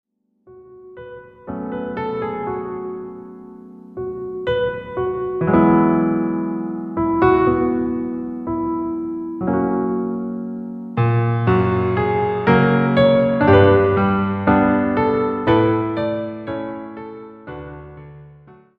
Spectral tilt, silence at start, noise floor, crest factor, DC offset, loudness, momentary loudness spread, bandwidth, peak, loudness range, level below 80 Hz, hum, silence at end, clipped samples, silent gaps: -10.5 dB/octave; 0.5 s; -50 dBFS; 18 dB; under 0.1%; -19 LUFS; 20 LU; 5.2 kHz; 0 dBFS; 12 LU; -44 dBFS; none; 0.25 s; under 0.1%; none